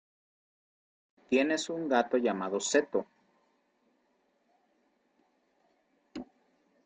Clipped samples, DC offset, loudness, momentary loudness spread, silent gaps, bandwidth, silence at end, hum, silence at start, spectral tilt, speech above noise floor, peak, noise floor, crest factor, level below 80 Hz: under 0.1%; under 0.1%; -30 LUFS; 19 LU; none; 9 kHz; 0.6 s; none; 1.3 s; -3.5 dB/octave; 44 dB; -12 dBFS; -74 dBFS; 22 dB; -76 dBFS